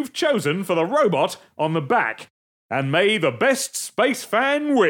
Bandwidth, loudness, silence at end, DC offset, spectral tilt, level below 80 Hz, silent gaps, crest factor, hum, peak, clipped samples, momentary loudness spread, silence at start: 18.5 kHz; -21 LUFS; 0 s; under 0.1%; -4 dB/octave; -74 dBFS; 2.30-2.69 s; 16 dB; none; -6 dBFS; under 0.1%; 7 LU; 0 s